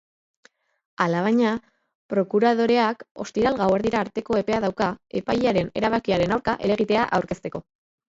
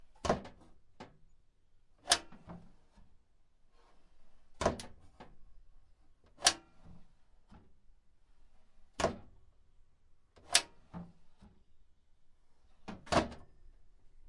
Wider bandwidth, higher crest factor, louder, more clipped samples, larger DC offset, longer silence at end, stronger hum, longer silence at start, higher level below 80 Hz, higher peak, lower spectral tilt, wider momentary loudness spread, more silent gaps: second, 7.8 kHz vs 11.5 kHz; second, 18 dB vs 32 dB; first, -23 LUFS vs -34 LUFS; neither; neither; first, 0.6 s vs 0 s; neither; first, 1 s vs 0 s; first, -52 dBFS vs -58 dBFS; about the same, -6 dBFS vs -8 dBFS; first, -6.5 dB/octave vs -2 dB/octave; second, 10 LU vs 26 LU; first, 1.95-2.09 s, 3.11-3.15 s vs none